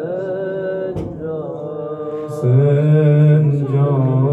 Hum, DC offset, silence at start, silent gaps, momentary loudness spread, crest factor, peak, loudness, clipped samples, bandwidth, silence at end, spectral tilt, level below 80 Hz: none; under 0.1%; 0 s; none; 14 LU; 12 dB; -4 dBFS; -17 LUFS; under 0.1%; 3.8 kHz; 0 s; -10.5 dB/octave; -50 dBFS